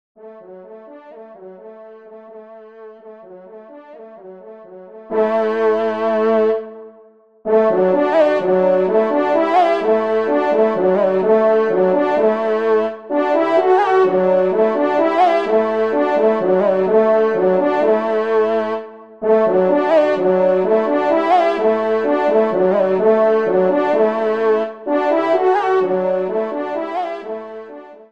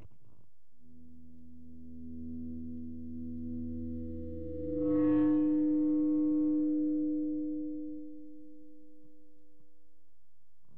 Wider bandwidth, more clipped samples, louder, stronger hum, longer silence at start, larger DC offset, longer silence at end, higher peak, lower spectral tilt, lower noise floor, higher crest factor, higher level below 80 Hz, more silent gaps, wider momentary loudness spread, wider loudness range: first, 7.4 kHz vs 2.6 kHz; neither; first, -16 LUFS vs -33 LUFS; neither; first, 0.25 s vs 0 s; second, 0.3% vs 0.7%; second, 0.15 s vs 2 s; first, -2 dBFS vs -20 dBFS; second, -7.5 dB/octave vs -11.5 dB/octave; second, -48 dBFS vs -78 dBFS; about the same, 14 dB vs 14 dB; second, -68 dBFS vs -56 dBFS; neither; second, 7 LU vs 21 LU; second, 4 LU vs 16 LU